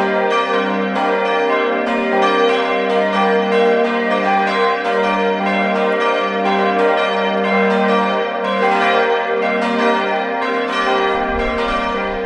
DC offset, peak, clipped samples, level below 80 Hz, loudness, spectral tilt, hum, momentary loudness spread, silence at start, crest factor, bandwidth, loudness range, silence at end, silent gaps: under 0.1%; -2 dBFS; under 0.1%; -42 dBFS; -16 LUFS; -5.5 dB/octave; none; 4 LU; 0 s; 14 dB; 9.8 kHz; 1 LU; 0 s; none